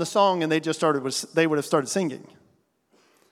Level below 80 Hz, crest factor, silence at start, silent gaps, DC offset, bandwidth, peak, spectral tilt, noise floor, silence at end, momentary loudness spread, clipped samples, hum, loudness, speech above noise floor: -82 dBFS; 20 dB; 0 s; none; under 0.1%; 16 kHz; -6 dBFS; -4.5 dB/octave; -65 dBFS; 1.1 s; 6 LU; under 0.1%; none; -24 LUFS; 42 dB